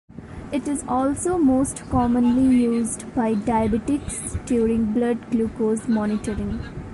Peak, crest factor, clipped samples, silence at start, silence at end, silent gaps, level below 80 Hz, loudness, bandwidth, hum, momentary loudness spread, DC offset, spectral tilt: -8 dBFS; 12 dB; under 0.1%; 0.15 s; 0 s; none; -40 dBFS; -22 LUFS; 11.5 kHz; none; 10 LU; under 0.1%; -6 dB/octave